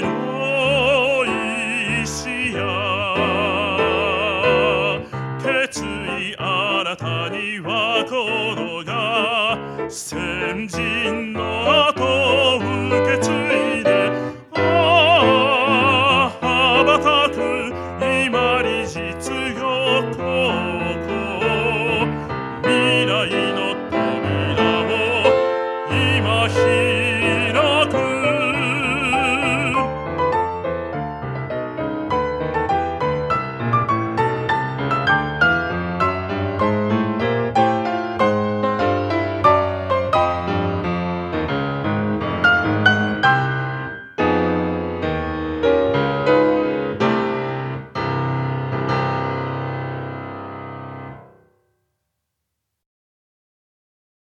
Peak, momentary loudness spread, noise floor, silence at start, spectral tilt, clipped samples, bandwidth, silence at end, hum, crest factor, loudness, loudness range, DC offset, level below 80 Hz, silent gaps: 0 dBFS; 10 LU; -78 dBFS; 0 s; -5 dB/octave; under 0.1%; 13.5 kHz; 2.95 s; none; 18 dB; -19 LUFS; 6 LU; under 0.1%; -44 dBFS; none